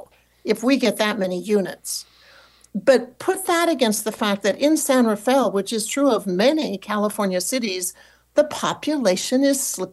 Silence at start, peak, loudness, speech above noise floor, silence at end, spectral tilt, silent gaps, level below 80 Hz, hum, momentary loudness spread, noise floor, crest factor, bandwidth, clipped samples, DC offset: 0.45 s; -6 dBFS; -21 LUFS; 31 dB; 0 s; -3.5 dB/octave; none; -66 dBFS; none; 7 LU; -51 dBFS; 16 dB; 13 kHz; under 0.1%; under 0.1%